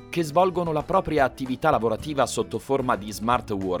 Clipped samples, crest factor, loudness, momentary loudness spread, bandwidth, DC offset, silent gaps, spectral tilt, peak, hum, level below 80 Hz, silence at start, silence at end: under 0.1%; 18 dB; -24 LUFS; 5 LU; over 20 kHz; under 0.1%; none; -5.5 dB/octave; -6 dBFS; none; -46 dBFS; 0 s; 0 s